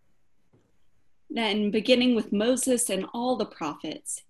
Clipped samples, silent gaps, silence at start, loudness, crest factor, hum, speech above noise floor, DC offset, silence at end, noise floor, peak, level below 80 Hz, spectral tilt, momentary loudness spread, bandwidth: under 0.1%; none; 1.3 s; -26 LUFS; 20 dB; none; 46 dB; under 0.1%; 0.1 s; -71 dBFS; -6 dBFS; -66 dBFS; -3.5 dB/octave; 12 LU; 13 kHz